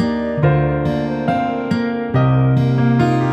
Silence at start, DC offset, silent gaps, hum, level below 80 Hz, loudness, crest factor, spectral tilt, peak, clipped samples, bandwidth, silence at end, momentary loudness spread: 0 s; under 0.1%; none; none; -38 dBFS; -17 LUFS; 12 dB; -9 dB/octave; -4 dBFS; under 0.1%; 8 kHz; 0 s; 5 LU